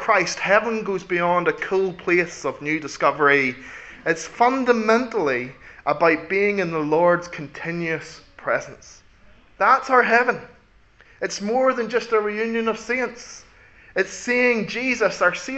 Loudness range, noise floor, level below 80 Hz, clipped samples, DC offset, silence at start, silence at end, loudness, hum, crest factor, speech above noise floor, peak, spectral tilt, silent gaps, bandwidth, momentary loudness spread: 3 LU; -53 dBFS; -58 dBFS; under 0.1%; under 0.1%; 0 s; 0 s; -21 LUFS; none; 20 dB; 32 dB; -2 dBFS; -4.5 dB/octave; none; 8.2 kHz; 12 LU